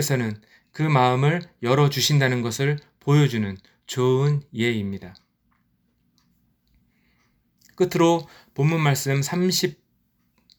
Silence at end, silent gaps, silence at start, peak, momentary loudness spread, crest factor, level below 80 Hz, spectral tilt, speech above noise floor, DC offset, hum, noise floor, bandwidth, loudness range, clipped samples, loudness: 0.85 s; none; 0 s; -4 dBFS; 12 LU; 20 dB; -62 dBFS; -5.5 dB/octave; 46 dB; under 0.1%; none; -68 dBFS; over 20 kHz; 9 LU; under 0.1%; -22 LUFS